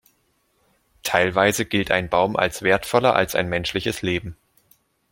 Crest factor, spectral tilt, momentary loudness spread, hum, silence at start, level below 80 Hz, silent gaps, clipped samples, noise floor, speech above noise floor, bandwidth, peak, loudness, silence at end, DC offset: 22 dB; -4 dB/octave; 7 LU; none; 1.05 s; -50 dBFS; none; under 0.1%; -66 dBFS; 46 dB; 16.5 kHz; -2 dBFS; -21 LUFS; 0.8 s; under 0.1%